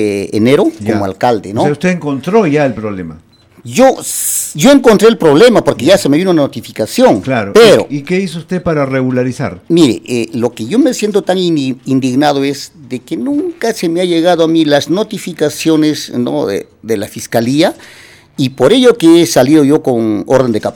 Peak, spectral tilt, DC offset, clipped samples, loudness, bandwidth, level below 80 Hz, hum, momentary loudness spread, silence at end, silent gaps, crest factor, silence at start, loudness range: 0 dBFS; -5 dB/octave; under 0.1%; 0.5%; -11 LUFS; 19 kHz; -46 dBFS; none; 11 LU; 0 s; none; 10 dB; 0 s; 5 LU